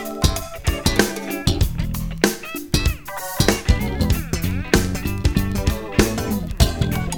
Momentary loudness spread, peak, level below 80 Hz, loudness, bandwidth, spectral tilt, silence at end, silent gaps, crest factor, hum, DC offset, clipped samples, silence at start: 6 LU; 0 dBFS; -26 dBFS; -21 LUFS; over 20 kHz; -4.5 dB/octave; 0 s; none; 20 dB; none; under 0.1%; under 0.1%; 0 s